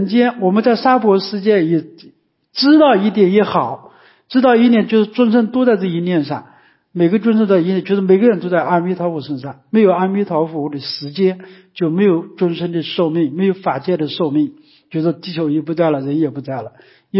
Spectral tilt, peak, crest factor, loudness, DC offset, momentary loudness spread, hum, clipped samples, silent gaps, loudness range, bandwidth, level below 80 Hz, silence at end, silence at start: -11 dB/octave; -2 dBFS; 14 dB; -15 LUFS; under 0.1%; 12 LU; none; under 0.1%; none; 5 LU; 5.8 kHz; -66 dBFS; 0 s; 0 s